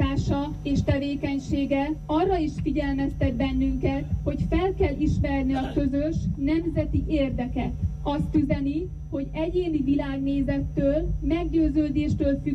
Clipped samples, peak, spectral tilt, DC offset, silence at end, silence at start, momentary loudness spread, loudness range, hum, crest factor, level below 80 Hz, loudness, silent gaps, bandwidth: under 0.1%; -12 dBFS; -8 dB/octave; under 0.1%; 0 s; 0 s; 4 LU; 1 LU; none; 12 dB; -32 dBFS; -26 LUFS; none; 8.2 kHz